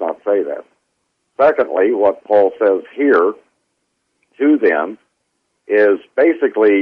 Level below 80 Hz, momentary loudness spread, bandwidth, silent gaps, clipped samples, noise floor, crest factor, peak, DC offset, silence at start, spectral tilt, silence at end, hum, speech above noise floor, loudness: -64 dBFS; 8 LU; 5 kHz; none; under 0.1%; -69 dBFS; 12 dB; -2 dBFS; under 0.1%; 0 s; -7.5 dB/octave; 0 s; none; 55 dB; -15 LUFS